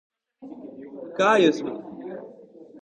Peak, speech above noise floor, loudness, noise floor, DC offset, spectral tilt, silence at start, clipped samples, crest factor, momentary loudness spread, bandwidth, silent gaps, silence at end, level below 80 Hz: -6 dBFS; 23 dB; -21 LUFS; -47 dBFS; under 0.1%; -5 dB/octave; 0.4 s; under 0.1%; 20 dB; 23 LU; 9.4 kHz; none; 0.05 s; -72 dBFS